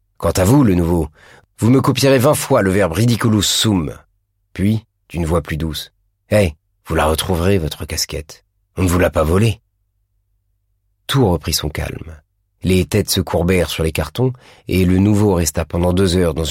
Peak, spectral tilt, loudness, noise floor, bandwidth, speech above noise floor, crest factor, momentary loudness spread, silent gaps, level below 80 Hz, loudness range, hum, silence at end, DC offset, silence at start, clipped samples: -2 dBFS; -5.5 dB/octave; -16 LUFS; -65 dBFS; 16.5 kHz; 50 dB; 14 dB; 12 LU; none; -32 dBFS; 5 LU; none; 0 s; under 0.1%; 0.2 s; under 0.1%